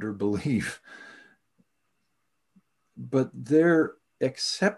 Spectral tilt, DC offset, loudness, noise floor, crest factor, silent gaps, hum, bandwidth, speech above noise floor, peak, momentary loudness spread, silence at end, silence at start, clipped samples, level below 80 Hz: -5.5 dB/octave; under 0.1%; -26 LUFS; -79 dBFS; 18 dB; none; none; 12.5 kHz; 53 dB; -10 dBFS; 22 LU; 0 s; 0 s; under 0.1%; -60 dBFS